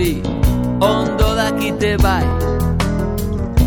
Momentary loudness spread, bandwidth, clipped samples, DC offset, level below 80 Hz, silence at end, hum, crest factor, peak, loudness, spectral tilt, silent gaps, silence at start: 4 LU; over 20 kHz; under 0.1%; 0.2%; -22 dBFS; 0 s; none; 14 dB; -2 dBFS; -17 LUFS; -6 dB/octave; none; 0 s